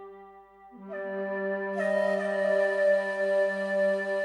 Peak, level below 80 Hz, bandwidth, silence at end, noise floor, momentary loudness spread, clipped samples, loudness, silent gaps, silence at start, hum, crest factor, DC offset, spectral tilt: -14 dBFS; -74 dBFS; 10.5 kHz; 0 s; -52 dBFS; 12 LU; under 0.1%; -27 LUFS; none; 0 s; 50 Hz at -70 dBFS; 14 dB; under 0.1%; -6 dB/octave